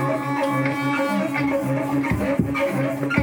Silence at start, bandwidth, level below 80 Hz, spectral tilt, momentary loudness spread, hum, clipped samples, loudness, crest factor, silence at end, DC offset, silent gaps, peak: 0 s; 19.5 kHz; -44 dBFS; -7 dB/octave; 1 LU; none; under 0.1%; -22 LUFS; 16 dB; 0 s; under 0.1%; none; -6 dBFS